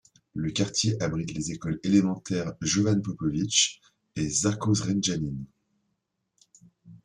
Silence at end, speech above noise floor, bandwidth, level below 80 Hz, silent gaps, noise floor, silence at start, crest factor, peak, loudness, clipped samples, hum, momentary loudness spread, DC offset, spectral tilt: 0.1 s; 52 dB; 11.5 kHz; -56 dBFS; none; -79 dBFS; 0.35 s; 22 dB; -6 dBFS; -27 LUFS; under 0.1%; none; 10 LU; under 0.1%; -4 dB/octave